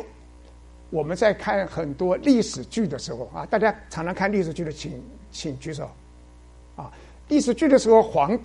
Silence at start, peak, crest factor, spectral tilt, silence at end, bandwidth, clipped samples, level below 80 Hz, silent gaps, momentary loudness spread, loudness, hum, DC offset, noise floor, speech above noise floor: 0 s; -4 dBFS; 20 dB; -5.5 dB/octave; 0 s; 11.5 kHz; under 0.1%; -48 dBFS; none; 21 LU; -23 LUFS; none; under 0.1%; -48 dBFS; 25 dB